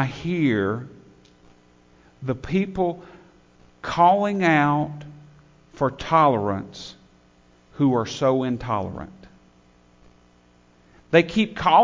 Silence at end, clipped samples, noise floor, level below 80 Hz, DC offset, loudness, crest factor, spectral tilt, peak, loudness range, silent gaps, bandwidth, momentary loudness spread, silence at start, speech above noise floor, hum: 0 s; under 0.1%; -56 dBFS; -52 dBFS; under 0.1%; -22 LUFS; 20 dB; -6.5 dB/octave; -2 dBFS; 6 LU; none; 7.6 kHz; 20 LU; 0 s; 35 dB; 60 Hz at -55 dBFS